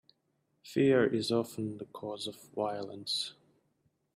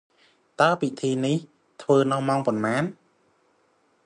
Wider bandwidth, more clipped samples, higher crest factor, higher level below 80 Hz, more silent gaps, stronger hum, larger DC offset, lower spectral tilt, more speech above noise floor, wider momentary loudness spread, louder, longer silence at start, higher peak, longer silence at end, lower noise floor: first, 15.5 kHz vs 10.5 kHz; neither; about the same, 20 dB vs 20 dB; about the same, -74 dBFS vs -70 dBFS; neither; neither; neither; about the same, -5 dB/octave vs -6 dB/octave; about the same, 45 dB vs 42 dB; first, 14 LU vs 8 LU; second, -33 LUFS vs -24 LUFS; about the same, 0.65 s vs 0.6 s; second, -14 dBFS vs -4 dBFS; second, 0.85 s vs 1.15 s; first, -77 dBFS vs -65 dBFS